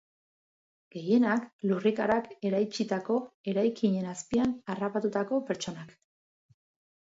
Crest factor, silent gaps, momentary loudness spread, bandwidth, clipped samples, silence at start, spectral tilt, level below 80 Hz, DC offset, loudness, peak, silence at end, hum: 16 dB; 1.53-1.59 s, 3.34-3.44 s; 8 LU; 8 kHz; under 0.1%; 0.95 s; -6 dB/octave; -68 dBFS; under 0.1%; -30 LUFS; -14 dBFS; 1.1 s; none